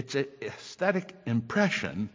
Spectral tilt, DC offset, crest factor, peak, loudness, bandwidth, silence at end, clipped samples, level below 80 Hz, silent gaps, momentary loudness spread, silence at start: -5.5 dB/octave; under 0.1%; 20 dB; -10 dBFS; -30 LUFS; 7.6 kHz; 0.05 s; under 0.1%; -62 dBFS; none; 10 LU; 0 s